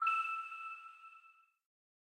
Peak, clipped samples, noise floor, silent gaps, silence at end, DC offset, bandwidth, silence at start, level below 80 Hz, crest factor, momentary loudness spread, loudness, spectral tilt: -22 dBFS; under 0.1%; -66 dBFS; none; 0.85 s; under 0.1%; 9.8 kHz; 0 s; under -90 dBFS; 20 dB; 22 LU; -40 LUFS; 5 dB/octave